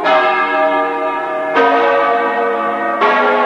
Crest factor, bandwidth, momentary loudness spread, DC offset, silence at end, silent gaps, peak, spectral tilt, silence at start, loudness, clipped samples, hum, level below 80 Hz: 12 dB; 10.5 kHz; 5 LU; under 0.1%; 0 s; none; -2 dBFS; -4.5 dB/octave; 0 s; -14 LUFS; under 0.1%; none; -68 dBFS